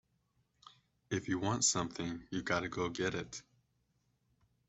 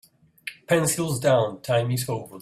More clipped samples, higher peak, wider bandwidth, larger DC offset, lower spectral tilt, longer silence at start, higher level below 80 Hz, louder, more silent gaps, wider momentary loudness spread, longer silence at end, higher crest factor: neither; second, -16 dBFS vs -8 dBFS; second, 8.2 kHz vs 16 kHz; neither; about the same, -3.5 dB/octave vs -4.5 dB/octave; first, 1.1 s vs 0.45 s; second, -66 dBFS vs -60 dBFS; second, -36 LUFS vs -23 LUFS; neither; second, 12 LU vs 17 LU; first, 1.3 s vs 0 s; first, 24 dB vs 18 dB